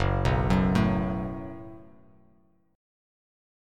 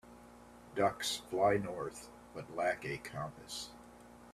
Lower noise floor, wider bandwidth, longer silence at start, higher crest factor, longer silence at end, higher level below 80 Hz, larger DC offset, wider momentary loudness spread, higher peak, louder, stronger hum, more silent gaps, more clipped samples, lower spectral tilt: first, -64 dBFS vs -57 dBFS; second, 10.5 kHz vs 15 kHz; about the same, 0 s vs 0.05 s; about the same, 18 dB vs 20 dB; first, 1.9 s vs 0 s; first, -38 dBFS vs -66 dBFS; neither; second, 19 LU vs 25 LU; first, -10 dBFS vs -18 dBFS; first, -26 LUFS vs -37 LUFS; neither; neither; neither; first, -8 dB/octave vs -4 dB/octave